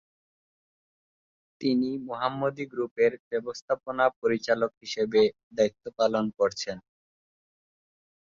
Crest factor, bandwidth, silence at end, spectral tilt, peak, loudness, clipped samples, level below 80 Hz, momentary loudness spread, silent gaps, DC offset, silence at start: 20 dB; 7.6 kHz; 1.6 s; -5 dB/octave; -10 dBFS; -28 LUFS; under 0.1%; -68 dBFS; 8 LU; 2.91-2.96 s, 3.20-3.31 s, 3.62-3.68 s, 4.16-4.22 s, 4.77-4.81 s, 5.43-5.51 s; under 0.1%; 1.6 s